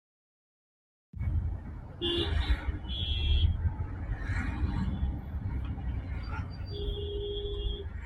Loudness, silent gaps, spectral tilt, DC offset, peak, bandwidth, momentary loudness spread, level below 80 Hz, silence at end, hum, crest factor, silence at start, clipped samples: -34 LUFS; none; -7 dB/octave; under 0.1%; -14 dBFS; 7.8 kHz; 9 LU; -36 dBFS; 0 s; none; 18 dB; 1.15 s; under 0.1%